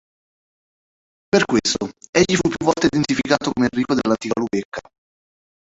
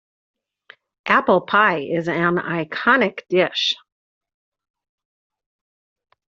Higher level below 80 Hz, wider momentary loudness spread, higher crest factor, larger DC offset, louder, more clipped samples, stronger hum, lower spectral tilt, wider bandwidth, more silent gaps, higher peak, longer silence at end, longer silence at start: first, -50 dBFS vs -64 dBFS; about the same, 7 LU vs 7 LU; about the same, 20 dB vs 22 dB; neither; about the same, -19 LUFS vs -19 LUFS; neither; neither; first, -4.5 dB/octave vs -2 dB/octave; about the same, 8.2 kHz vs 7.6 kHz; first, 2.09-2.13 s, 4.65-4.72 s vs none; about the same, -2 dBFS vs 0 dBFS; second, 1 s vs 2.55 s; first, 1.35 s vs 1.05 s